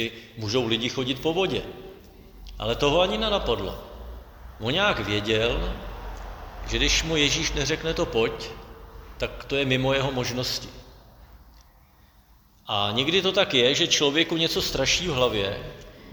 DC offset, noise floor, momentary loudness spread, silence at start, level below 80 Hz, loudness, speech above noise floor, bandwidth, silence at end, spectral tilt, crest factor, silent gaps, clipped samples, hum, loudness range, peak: under 0.1%; -56 dBFS; 20 LU; 0 s; -40 dBFS; -24 LUFS; 31 dB; over 20 kHz; 0 s; -3.5 dB/octave; 20 dB; none; under 0.1%; none; 6 LU; -6 dBFS